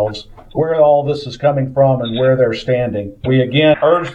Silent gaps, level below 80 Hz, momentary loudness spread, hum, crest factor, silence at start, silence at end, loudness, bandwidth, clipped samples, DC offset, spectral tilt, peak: none; -44 dBFS; 10 LU; none; 14 dB; 0 s; 0 s; -15 LUFS; 8.2 kHz; under 0.1%; under 0.1%; -7.5 dB/octave; 0 dBFS